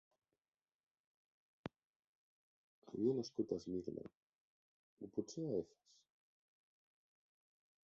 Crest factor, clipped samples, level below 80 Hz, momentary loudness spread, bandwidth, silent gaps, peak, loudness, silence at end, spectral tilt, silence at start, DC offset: 24 dB; under 0.1%; -80 dBFS; 17 LU; 7.4 kHz; 1.84-2.82 s, 4.15-4.97 s; -26 dBFS; -44 LUFS; 2.2 s; -7.5 dB/octave; 1.65 s; under 0.1%